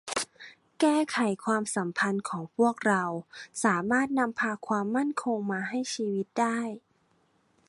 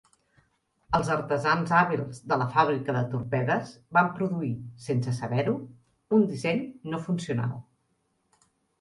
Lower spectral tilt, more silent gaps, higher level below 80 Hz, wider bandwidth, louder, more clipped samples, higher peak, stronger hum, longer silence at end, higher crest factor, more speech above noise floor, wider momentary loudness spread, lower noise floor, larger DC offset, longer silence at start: second, -4.5 dB/octave vs -7 dB/octave; neither; second, -74 dBFS vs -60 dBFS; about the same, 11.5 kHz vs 11.5 kHz; about the same, -29 LUFS vs -27 LUFS; neither; about the same, -10 dBFS vs -8 dBFS; neither; second, 0.9 s vs 1.2 s; about the same, 18 dB vs 20 dB; second, 41 dB vs 47 dB; about the same, 9 LU vs 10 LU; second, -69 dBFS vs -73 dBFS; neither; second, 0.05 s vs 0.9 s